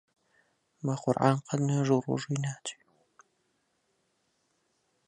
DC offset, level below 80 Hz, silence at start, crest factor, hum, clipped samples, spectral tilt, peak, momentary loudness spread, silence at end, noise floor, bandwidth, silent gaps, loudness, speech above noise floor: under 0.1%; -74 dBFS; 0.85 s; 24 dB; none; under 0.1%; -6.5 dB/octave; -8 dBFS; 11 LU; 2.35 s; -75 dBFS; 10 kHz; none; -30 LUFS; 47 dB